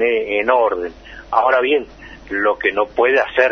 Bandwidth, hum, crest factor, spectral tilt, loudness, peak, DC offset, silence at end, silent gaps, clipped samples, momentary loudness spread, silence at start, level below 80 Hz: 6.4 kHz; none; 16 dB; -5 dB/octave; -17 LUFS; 0 dBFS; under 0.1%; 0 s; none; under 0.1%; 11 LU; 0 s; -46 dBFS